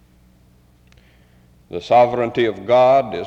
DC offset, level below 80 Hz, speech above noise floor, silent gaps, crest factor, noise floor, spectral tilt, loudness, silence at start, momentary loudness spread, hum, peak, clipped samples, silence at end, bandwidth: under 0.1%; -54 dBFS; 37 dB; none; 14 dB; -52 dBFS; -6.5 dB/octave; -16 LUFS; 1.7 s; 14 LU; none; -4 dBFS; under 0.1%; 0 s; 7.8 kHz